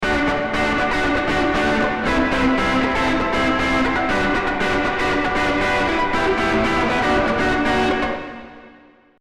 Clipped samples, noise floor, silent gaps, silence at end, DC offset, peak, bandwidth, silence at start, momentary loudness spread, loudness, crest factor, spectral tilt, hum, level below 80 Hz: under 0.1%; -49 dBFS; none; 0.5 s; under 0.1%; -6 dBFS; 13 kHz; 0 s; 2 LU; -19 LUFS; 12 dB; -5 dB/octave; none; -34 dBFS